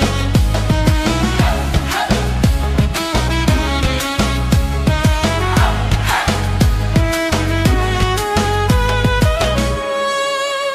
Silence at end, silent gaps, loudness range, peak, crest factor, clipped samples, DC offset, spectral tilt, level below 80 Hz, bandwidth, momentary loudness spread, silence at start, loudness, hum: 0 s; none; 1 LU; -2 dBFS; 14 dB; under 0.1%; under 0.1%; -5 dB/octave; -20 dBFS; 15.5 kHz; 2 LU; 0 s; -16 LUFS; none